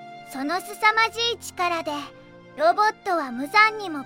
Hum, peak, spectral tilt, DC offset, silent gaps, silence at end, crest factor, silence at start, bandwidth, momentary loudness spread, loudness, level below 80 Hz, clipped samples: none; -4 dBFS; -2 dB/octave; under 0.1%; none; 0 s; 20 dB; 0 s; 16.5 kHz; 14 LU; -22 LUFS; -68 dBFS; under 0.1%